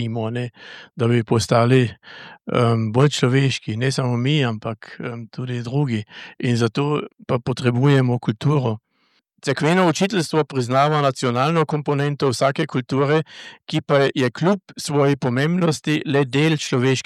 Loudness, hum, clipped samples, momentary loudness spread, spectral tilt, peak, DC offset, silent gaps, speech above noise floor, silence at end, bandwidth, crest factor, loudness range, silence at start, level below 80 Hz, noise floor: -20 LUFS; none; under 0.1%; 12 LU; -6 dB/octave; -4 dBFS; under 0.1%; none; 45 dB; 0.05 s; 13 kHz; 16 dB; 4 LU; 0 s; -60 dBFS; -65 dBFS